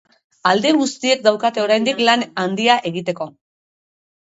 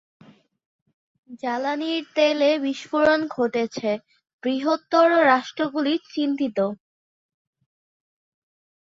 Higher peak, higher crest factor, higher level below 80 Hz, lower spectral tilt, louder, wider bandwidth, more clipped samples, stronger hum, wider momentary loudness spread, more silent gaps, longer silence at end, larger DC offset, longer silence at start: first, 0 dBFS vs -4 dBFS; about the same, 18 dB vs 20 dB; about the same, -68 dBFS vs -68 dBFS; about the same, -3.5 dB/octave vs -4.5 dB/octave; first, -17 LUFS vs -22 LUFS; about the same, 8 kHz vs 7.6 kHz; neither; neither; about the same, 9 LU vs 10 LU; second, none vs 4.33-4.39 s; second, 1 s vs 2.15 s; neither; second, 0.45 s vs 1.3 s